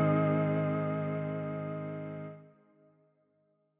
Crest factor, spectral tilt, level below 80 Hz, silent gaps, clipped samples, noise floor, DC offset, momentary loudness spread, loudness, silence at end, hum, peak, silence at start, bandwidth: 16 dB; -8.5 dB/octave; -72 dBFS; none; under 0.1%; -74 dBFS; under 0.1%; 15 LU; -33 LUFS; 1.3 s; none; -18 dBFS; 0 s; 3.8 kHz